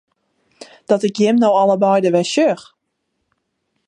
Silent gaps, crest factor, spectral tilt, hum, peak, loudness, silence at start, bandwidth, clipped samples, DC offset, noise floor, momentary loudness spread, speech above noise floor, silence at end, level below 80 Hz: none; 16 dB; -5.5 dB/octave; none; -2 dBFS; -15 LUFS; 0.6 s; 11 kHz; under 0.1%; under 0.1%; -72 dBFS; 5 LU; 58 dB; 1.25 s; -70 dBFS